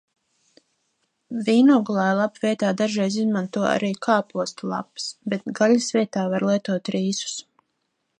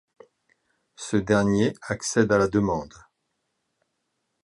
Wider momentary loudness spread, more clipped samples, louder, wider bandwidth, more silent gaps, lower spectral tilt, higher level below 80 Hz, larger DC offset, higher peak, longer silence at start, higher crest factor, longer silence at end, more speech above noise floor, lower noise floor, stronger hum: about the same, 12 LU vs 10 LU; neither; about the same, -22 LUFS vs -23 LUFS; second, 10 kHz vs 11.5 kHz; neither; about the same, -5 dB/octave vs -5.5 dB/octave; second, -72 dBFS vs -52 dBFS; neither; about the same, -4 dBFS vs -6 dBFS; first, 1.3 s vs 1 s; about the same, 18 dB vs 20 dB; second, 0.8 s vs 1.6 s; about the same, 53 dB vs 54 dB; about the same, -75 dBFS vs -77 dBFS; neither